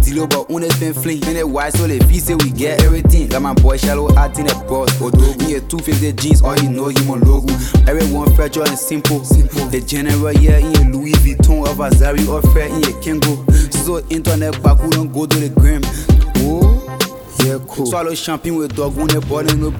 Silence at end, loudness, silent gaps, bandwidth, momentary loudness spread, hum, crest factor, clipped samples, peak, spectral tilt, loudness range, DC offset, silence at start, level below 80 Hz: 0 s; -14 LUFS; none; 19 kHz; 6 LU; none; 12 dB; under 0.1%; 0 dBFS; -5.5 dB/octave; 2 LU; under 0.1%; 0 s; -16 dBFS